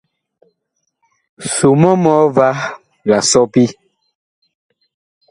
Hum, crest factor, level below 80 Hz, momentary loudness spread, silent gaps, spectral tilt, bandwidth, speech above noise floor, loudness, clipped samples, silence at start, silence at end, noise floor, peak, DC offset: none; 16 dB; -54 dBFS; 12 LU; none; -5 dB/octave; 11.5 kHz; 59 dB; -13 LUFS; under 0.1%; 1.4 s; 1.6 s; -71 dBFS; 0 dBFS; under 0.1%